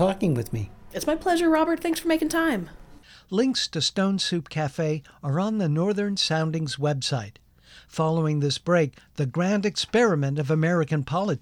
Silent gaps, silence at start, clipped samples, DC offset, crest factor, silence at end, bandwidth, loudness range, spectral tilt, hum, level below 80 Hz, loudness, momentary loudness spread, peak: none; 0 s; under 0.1%; under 0.1%; 14 dB; 0.05 s; 19 kHz; 2 LU; -5.5 dB/octave; none; -52 dBFS; -25 LUFS; 8 LU; -10 dBFS